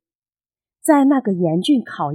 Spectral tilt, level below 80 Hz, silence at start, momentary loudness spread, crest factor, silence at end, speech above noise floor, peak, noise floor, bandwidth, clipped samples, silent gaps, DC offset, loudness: -6 dB/octave; -76 dBFS; 0.85 s; 5 LU; 18 dB; 0 s; over 74 dB; 0 dBFS; under -90 dBFS; 15 kHz; under 0.1%; none; under 0.1%; -17 LUFS